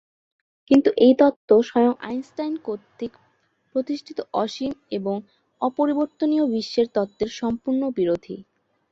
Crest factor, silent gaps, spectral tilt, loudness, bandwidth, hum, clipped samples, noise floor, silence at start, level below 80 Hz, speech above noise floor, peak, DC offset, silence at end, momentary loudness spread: 20 dB; 1.36-1.48 s; -6.5 dB/octave; -22 LUFS; 7.6 kHz; none; under 0.1%; -66 dBFS; 0.7 s; -62 dBFS; 44 dB; -4 dBFS; under 0.1%; 0.5 s; 14 LU